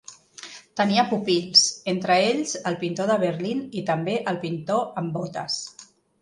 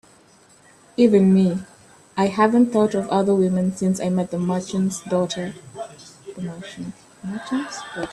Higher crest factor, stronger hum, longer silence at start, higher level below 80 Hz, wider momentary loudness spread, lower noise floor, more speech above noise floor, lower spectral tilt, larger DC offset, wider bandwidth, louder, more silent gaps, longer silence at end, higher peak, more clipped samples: about the same, 20 dB vs 18 dB; neither; second, 0.1 s vs 1 s; second, -68 dBFS vs -60 dBFS; second, 15 LU vs 19 LU; second, -44 dBFS vs -53 dBFS; second, 20 dB vs 33 dB; second, -3.5 dB/octave vs -6.5 dB/octave; neither; about the same, 11.5 kHz vs 12 kHz; second, -23 LUFS vs -20 LUFS; neither; first, 0.4 s vs 0 s; about the same, -4 dBFS vs -4 dBFS; neither